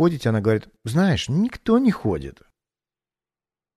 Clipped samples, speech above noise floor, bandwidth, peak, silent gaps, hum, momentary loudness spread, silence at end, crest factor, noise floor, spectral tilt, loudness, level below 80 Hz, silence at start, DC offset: under 0.1%; over 69 dB; 13.5 kHz; -6 dBFS; none; none; 7 LU; 1.45 s; 16 dB; under -90 dBFS; -7 dB/octave; -22 LUFS; -48 dBFS; 0 s; under 0.1%